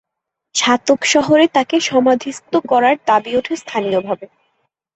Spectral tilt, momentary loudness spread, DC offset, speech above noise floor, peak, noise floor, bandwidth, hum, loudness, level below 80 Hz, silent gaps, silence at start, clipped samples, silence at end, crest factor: -3 dB/octave; 8 LU; under 0.1%; 64 dB; -2 dBFS; -79 dBFS; 8.4 kHz; none; -15 LUFS; -58 dBFS; none; 0.55 s; under 0.1%; 0.7 s; 14 dB